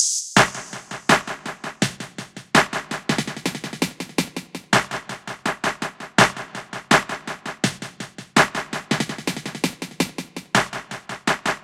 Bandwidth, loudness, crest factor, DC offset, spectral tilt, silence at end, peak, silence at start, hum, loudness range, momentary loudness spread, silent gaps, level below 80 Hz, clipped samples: 16.5 kHz; -22 LUFS; 24 dB; under 0.1%; -3 dB/octave; 0 s; 0 dBFS; 0 s; none; 3 LU; 16 LU; none; -54 dBFS; under 0.1%